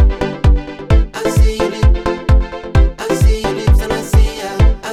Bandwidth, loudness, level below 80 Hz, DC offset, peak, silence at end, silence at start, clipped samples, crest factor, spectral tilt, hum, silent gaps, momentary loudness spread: 13.5 kHz; -15 LUFS; -14 dBFS; under 0.1%; 0 dBFS; 0 s; 0 s; under 0.1%; 12 dB; -6.5 dB/octave; none; none; 3 LU